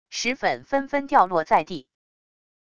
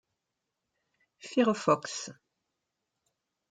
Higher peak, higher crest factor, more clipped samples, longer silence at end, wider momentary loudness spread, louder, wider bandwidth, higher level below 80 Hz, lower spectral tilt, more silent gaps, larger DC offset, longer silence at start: first, -4 dBFS vs -10 dBFS; about the same, 20 dB vs 24 dB; neither; second, 0.8 s vs 1.4 s; second, 9 LU vs 17 LU; first, -22 LUFS vs -29 LUFS; about the same, 10 kHz vs 9.6 kHz; first, -60 dBFS vs -82 dBFS; about the same, -3.5 dB/octave vs -4.5 dB/octave; neither; first, 0.4% vs under 0.1%; second, 0.1 s vs 1.25 s